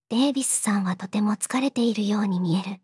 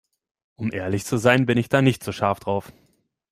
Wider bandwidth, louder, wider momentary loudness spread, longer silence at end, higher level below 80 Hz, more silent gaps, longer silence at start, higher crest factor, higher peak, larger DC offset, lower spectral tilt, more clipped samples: second, 12 kHz vs 15.5 kHz; about the same, -24 LUFS vs -22 LUFS; second, 4 LU vs 10 LU; second, 0.05 s vs 0.6 s; second, -82 dBFS vs -58 dBFS; neither; second, 0.1 s vs 0.6 s; second, 14 dB vs 20 dB; second, -10 dBFS vs -2 dBFS; neither; second, -4.5 dB/octave vs -6 dB/octave; neither